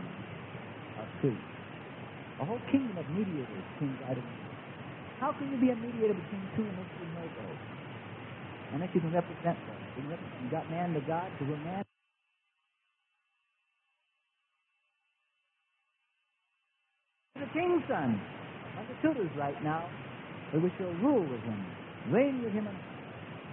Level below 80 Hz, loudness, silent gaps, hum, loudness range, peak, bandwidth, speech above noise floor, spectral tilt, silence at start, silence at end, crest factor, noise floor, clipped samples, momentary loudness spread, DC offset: -72 dBFS; -35 LUFS; none; none; 6 LU; -14 dBFS; 3.9 kHz; 48 dB; -6.5 dB/octave; 0 s; 0 s; 22 dB; -81 dBFS; under 0.1%; 14 LU; under 0.1%